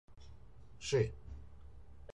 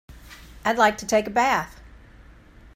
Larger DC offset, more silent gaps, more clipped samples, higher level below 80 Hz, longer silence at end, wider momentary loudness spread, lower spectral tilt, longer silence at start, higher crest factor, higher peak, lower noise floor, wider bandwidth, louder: first, 0.2% vs under 0.1%; neither; neither; second, -56 dBFS vs -48 dBFS; second, 0 s vs 0.95 s; first, 25 LU vs 8 LU; first, -5.5 dB/octave vs -3.5 dB/octave; about the same, 0.15 s vs 0.1 s; about the same, 22 dB vs 22 dB; second, -20 dBFS vs -4 dBFS; first, -58 dBFS vs -49 dBFS; second, 11 kHz vs 16 kHz; second, -37 LUFS vs -22 LUFS